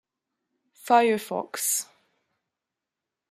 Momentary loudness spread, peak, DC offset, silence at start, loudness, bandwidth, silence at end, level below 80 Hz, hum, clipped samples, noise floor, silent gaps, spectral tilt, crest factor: 19 LU; -6 dBFS; under 0.1%; 0.85 s; -24 LUFS; 15.5 kHz; 1.5 s; -84 dBFS; none; under 0.1%; -87 dBFS; none; -2 dB/octave; 22 dB